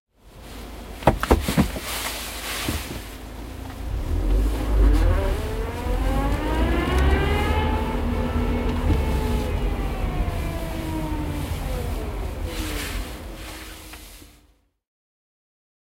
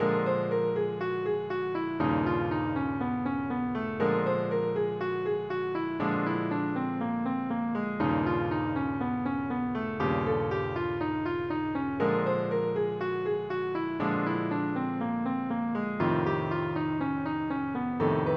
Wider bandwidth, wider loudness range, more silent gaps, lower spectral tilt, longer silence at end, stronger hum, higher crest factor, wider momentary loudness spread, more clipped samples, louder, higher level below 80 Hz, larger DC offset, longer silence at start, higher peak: first, 16 kHz vs 6 kHz; first, 9 LU vs 1 LU; neither; second, -5.5 dB/octave vs -9.5 dB/octave; first, 1.75 s vs 0 s; neither; first, 24 dB vs 16 dB; first, 16 LU vs 4 LU; neither; first, -25 LUFS vs -30 LUFS; first, -26 dBFS vs -58 dBFS; neither; first, 0.25 s vs 0 s; first, 0 dBFS vs -14 dBFS